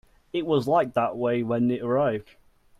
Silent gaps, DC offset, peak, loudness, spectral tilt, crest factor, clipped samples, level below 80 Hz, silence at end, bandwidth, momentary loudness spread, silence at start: none; under 0.1%; -10 dBFS; -25 LUFS; -8 dB/octave; 16 dB; under 0.1%; -60 dBFS; 0.6 s; 13.5 kHz; 8 LU; 0.35 s